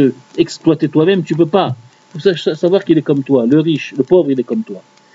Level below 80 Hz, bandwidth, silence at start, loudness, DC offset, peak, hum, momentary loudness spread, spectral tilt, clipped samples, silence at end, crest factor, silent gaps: -58 dBFS; 7.8 kHz; 0 s; -14 LUFS; under 0.1%; 0 dBFS; none; 9 LU; -7 dB/octave; under 0.1%; 0.35 s; 14 dB; none